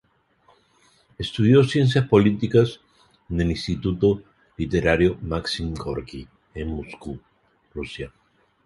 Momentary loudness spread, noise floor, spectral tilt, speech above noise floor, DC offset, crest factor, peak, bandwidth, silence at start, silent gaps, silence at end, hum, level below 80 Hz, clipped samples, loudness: 19 LU; -61 dBFS; -7 dB/octave; 40 dB; under 0.1%; 20 dB; -2 dBFS; 11.5 kHz; 1.2 s; none; 0.6 s; none; -40 dBFS; under 0.1%; -22 LUFS